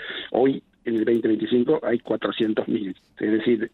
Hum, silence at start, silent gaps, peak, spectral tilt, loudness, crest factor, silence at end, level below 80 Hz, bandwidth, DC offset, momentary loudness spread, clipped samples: none; 0 s; none; -8 dBFS; -8 dB/octave; -23 LUFS; 14 dB; 0.05 s; -64 dBFS; 4.3 kHz; under 0.1%; 7 LU; under 0.1%